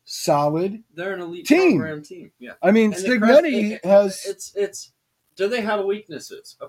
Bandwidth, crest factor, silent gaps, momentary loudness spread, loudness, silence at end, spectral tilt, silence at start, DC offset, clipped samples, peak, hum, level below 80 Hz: 16 kHz; 20 dB; none; 20 LU; -20 LUFS; 0 s; -5 dB/octave; 0.1 s; under 0.1%; under 0.1%; -2 dBFS; none; -68 dBFS